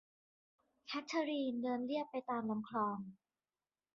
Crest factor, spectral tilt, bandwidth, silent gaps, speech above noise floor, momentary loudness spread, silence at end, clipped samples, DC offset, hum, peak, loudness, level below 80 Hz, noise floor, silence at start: 16 dB; -4 dB/octave; 7 kHz; none; over 51 dB; 8 LU; 0.8 s; under 0.1%; under 0.1%; none; -24 dBFS; -40 LUFS; -84 dBFS; under -90 dBFS; 0.85 s